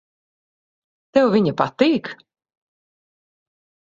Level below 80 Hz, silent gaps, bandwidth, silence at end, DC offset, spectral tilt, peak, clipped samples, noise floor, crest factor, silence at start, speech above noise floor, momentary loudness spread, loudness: -64 dBFS; none; 7.6 kHz; 1.7 s; under 0.1%; -7 dB/octave; -2 dBFS; under 0.1%; under -90 dBFS; 22 dB; 1.15 s; over 72 dB; 7 LU; -19 LUFS